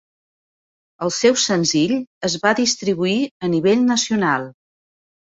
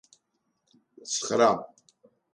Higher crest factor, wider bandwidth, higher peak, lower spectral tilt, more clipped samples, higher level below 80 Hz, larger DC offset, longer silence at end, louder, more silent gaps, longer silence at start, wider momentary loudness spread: about the same, 18 dB vs 22 dB; second, 8 kHz vs 11.5 kHz; first, -2 dBFS vs -8 dBFS; about the same, -3.5 dB/octave vs -3 dB/octave; neither; first, -60 dBFS vs -74 dBFS; neither; first, 0.85 s vs 0.7 s; first, -18 LUFS vs -26 LUFS; first, 2.07-2.21 s, 3.31-3.40 s vs none; about the same, 1 s vs 1.05 s; second, 8 LU vs 24 LU